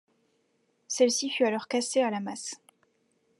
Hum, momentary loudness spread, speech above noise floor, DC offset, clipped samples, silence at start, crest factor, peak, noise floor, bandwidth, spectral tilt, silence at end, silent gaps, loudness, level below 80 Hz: none; 13 LU; 45 dB; under 0.1%; under 0.1%; 0.9 s; 20 dB; -10 dBFS; -72 dBFS; 12.5 kHz; -2.5 dB/octave; 0.85 s; none; -28 LUFS; under -90 dBFS